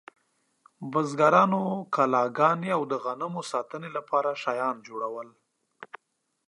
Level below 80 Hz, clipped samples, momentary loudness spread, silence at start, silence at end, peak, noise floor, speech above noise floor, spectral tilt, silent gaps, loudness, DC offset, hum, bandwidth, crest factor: -82 dBFS; under 0.1%; 19 LU; 0.8 s; 0.5 s; -6 dBFS; -77 dBFS; 51 dB; -6 dB/octave; none; -26 LUFS; under 0.1%; none; 11.5 kHz; 22 dB